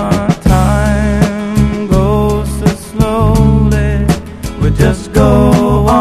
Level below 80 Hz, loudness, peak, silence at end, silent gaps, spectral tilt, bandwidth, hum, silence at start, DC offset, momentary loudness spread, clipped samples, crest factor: -18 dBFS; -11 LUFS; 0 dBFS; 0 s; none; -7 dB/octave; 14.5 kHz; none; 0 s; under 0.1%; 6 LU; 0.3%; 10 dB